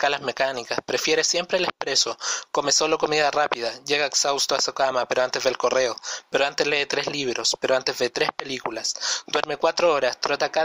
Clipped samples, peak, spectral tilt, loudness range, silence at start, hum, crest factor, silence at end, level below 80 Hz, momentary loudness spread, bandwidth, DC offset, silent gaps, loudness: under 0.1%; -6 dBFS; -1 dB/octave; 2 LU; 0 s; none; 18 dB; 0 s; -64 dBFS; 6 LU; 16 kHz; under 0.1%; none; -23 LUFS